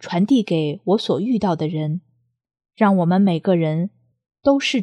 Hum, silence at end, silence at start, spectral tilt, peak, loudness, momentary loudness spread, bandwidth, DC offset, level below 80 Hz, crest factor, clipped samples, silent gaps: none; 0 s; 0 s; -7 dB/octave; -2 dBFS; -19 LUFS; 8 LU; 9.8 kHz; under 0.1%; -60 dBFS; 16 dB; under 0.1%; none